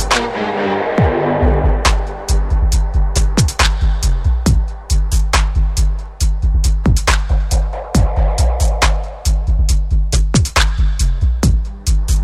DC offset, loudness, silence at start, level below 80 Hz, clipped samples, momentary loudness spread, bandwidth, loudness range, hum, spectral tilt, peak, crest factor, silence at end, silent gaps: under 0.1%; -16 LUFS; 0 s; -14 dBFS; under 0.1%; 5 LU; 13 kHz; 1 LU; none; -4.5 dB/octave; 0 dBFS; 14 dB; 0 s; none